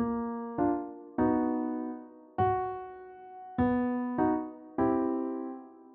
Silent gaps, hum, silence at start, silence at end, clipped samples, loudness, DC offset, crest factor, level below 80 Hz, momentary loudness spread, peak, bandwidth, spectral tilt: none; none; 0 s; 0 s; under 0.1%; -32 LUFS; under 0.1%; 16 dB; -58 dBFS; 15 LU; -16 dBFS; 3.8 kHz; -8 dB/octave